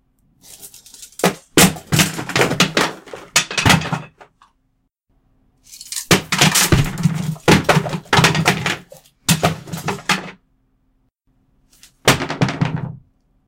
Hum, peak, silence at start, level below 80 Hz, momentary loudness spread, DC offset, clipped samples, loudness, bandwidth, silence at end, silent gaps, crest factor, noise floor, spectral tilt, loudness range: none; 0 dBFS; 0.5 s; -40 dBFS; 17 LU; under 0.1%; under 0.1%; -16 LUFS; 17 kHz; 0.5 s; none; 20 dB; -66 dBFS; -3.5 dB/octave; 7 LU